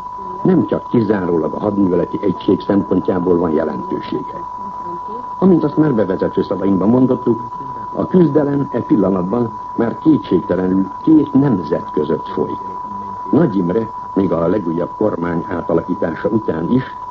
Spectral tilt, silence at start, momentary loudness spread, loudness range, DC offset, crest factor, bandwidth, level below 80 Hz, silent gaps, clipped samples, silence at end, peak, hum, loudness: -10 dB/octave; 0 s; 11 LU; 3 LU; under 0.1%; 16 dB; 6.2 kHz; -48 dBFS; none; under 0.1%; 0 s; 0 dBFS; none; -17 LUFS